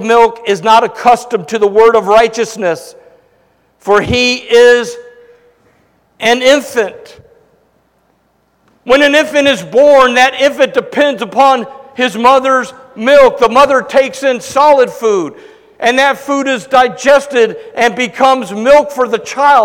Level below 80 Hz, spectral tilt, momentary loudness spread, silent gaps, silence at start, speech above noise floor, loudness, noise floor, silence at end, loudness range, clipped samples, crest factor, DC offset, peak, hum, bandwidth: -44 dBFS; -3.5 dB/octave; 9 LU; none; 0 s; 46 dB; -10 LUFS; -56 dBFS; 0 s; 4 LU; 1%; 10 dB; under 0.1%; 0 dBFS; none; 17 kHz